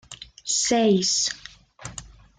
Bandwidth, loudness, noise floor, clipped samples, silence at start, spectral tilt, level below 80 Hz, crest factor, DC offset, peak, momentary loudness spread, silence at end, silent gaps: 10.5 kHz; -21 LUFS; -43 dBFS; under 0.1%; 0.1 s; -3 dB/octave; -54 dBFS; 16 dB; under 0.1%; -10 dBFS; 22 LU; 0.3 s; none